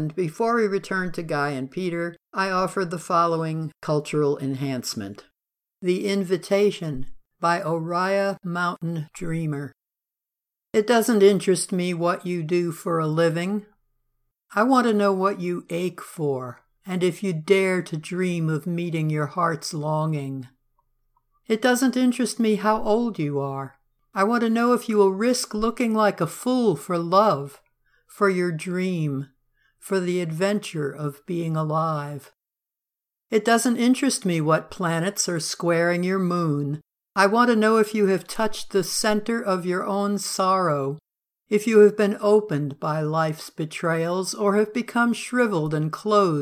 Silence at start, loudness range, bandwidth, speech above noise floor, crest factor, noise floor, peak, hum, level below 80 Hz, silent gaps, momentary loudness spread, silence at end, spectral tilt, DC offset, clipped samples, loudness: 0 s; 5 LU; 16 kHz; 65 dB; 20 dB; -87 dBFS; -4 dBFS; none; -58 dBFS; none; 11 LU; 0 s; -5.5 dB/octave; under 0.1%; under 0.1%; -23 LUFS